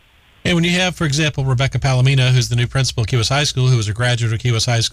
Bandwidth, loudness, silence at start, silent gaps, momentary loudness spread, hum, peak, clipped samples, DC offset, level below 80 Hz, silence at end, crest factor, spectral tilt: 13.5 kHz; -16 LUFS; 0.45 s; none; 4 LU; none; -6 dBFS; under 0.1%; under 0.1%; -38 dBFS; 0.05 s; 10 dB; -4.5 dB/octave